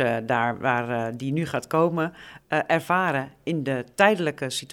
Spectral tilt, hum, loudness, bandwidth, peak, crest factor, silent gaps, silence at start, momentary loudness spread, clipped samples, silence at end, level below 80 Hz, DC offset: -5.5 dB/octave; none; -24 LUFS; 18 kHz; -2 dBFS; 22 dB; none; 0 s; 8 LU; under 0.1%; 0 s; -64 dBFS; under 0.1%